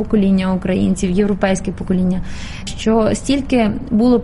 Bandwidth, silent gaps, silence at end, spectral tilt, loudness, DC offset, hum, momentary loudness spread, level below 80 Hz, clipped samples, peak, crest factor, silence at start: 11.5 kHz; none; 0 s; -6.5 dB/octave; -17 LUFS; under 0.1%; none; 7 LU; -30 dBFS; under 0.1%; 0 dBFS; 16 dB; 0 s